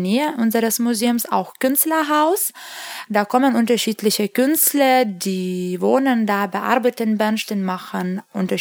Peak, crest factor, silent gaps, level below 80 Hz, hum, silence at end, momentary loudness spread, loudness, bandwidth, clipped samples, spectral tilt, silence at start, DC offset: -2 dBFS; 18 dB; none; -74 dBFS; none; 0 s; 9 LU; -19 LUFS; over 20 kHz; under 0.1%; -4 dB/octave; 0 s; under 0.1%